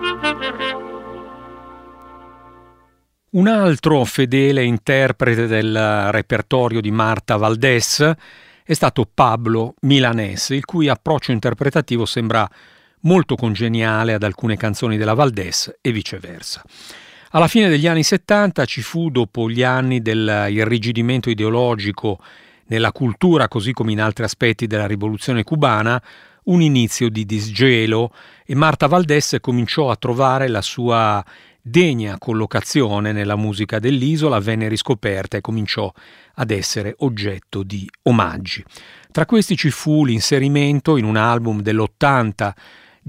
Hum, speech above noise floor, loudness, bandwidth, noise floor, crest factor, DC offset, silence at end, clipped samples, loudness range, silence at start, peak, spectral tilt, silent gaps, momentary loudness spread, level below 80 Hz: none; 43 dB; -17 LUFS; 16 kHz; -60 dBFS; 18 dB; under 0.1%; 0.55 s; under 0.1%; 4 LU; 0 s; 0 dBFS; -5.5 dB/octave; none; 10 LU; -50 dBFS